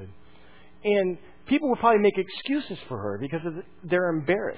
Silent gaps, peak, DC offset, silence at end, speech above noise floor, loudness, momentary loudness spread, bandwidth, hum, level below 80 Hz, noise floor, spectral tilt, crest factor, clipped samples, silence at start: none; -6 dBFS; 0.4%; 0 s; 29 dB; -26 LUFS; 13 LU; 4 kHz; none; -60 dBFS; -54 dBFS; -10 dB/octave; 20 dB; under 0.1%; 0 s